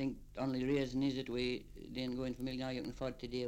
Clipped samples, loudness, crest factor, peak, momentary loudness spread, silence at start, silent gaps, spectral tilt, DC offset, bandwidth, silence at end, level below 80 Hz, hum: under 0.1%; -39 LUFS; 14 dB; -24 dBFS; 7 LU; 0 s; none; -6.5 dB/octave; under 0.1%; 15.5 kHz; 0 s; -56 dBFS; 50 Hz at -65 dBFS